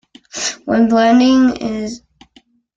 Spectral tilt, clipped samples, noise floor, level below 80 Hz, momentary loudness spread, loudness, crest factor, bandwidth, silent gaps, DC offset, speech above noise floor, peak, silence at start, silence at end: -4 dB/octave; under 0.1%; -52 dBFS; -50 dBFS; 17 LU; -14 LUFS; 14 dB; 7.8 kHz; none; under 0.1%; 40 dB; -2 dBFS; 0.35 s; 0.8 s